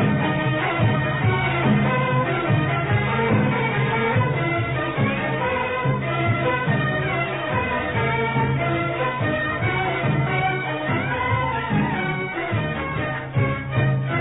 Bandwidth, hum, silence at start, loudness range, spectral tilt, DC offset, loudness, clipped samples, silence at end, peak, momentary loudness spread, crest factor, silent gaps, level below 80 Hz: 4 kHz; none; 0 s; 2 LU; -11.5 dB/octave; 0.2%; -22 LUFS; under 0.1%; 0 s; -8 dBFS; 4 LU; 14 dB; none; -42 dBFS